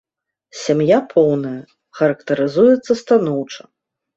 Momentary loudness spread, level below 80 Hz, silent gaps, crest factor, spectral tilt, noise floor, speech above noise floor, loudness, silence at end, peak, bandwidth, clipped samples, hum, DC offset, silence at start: 17 LU; -62 dBFS; none; 16 dB; -6.5 dB/octave; -55 dBFS; 40 dB; -16 LUFS; 0.6 s; -2 dBFS; 8 kHz; under 0.1%; none; under 0.1%; 0.55 s